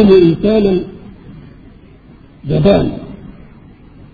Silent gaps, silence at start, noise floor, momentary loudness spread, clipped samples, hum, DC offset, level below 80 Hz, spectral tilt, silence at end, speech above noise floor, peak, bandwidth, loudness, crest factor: none; 0 s; -40 dBFS; 25 LU; under 0.1%; none; under 0.1%; -34 dBFS; -10 dB/octave; 0.8 s; 30 dB; 0 dBFS; 4.9 kHz; -12 LUFS; 14 dB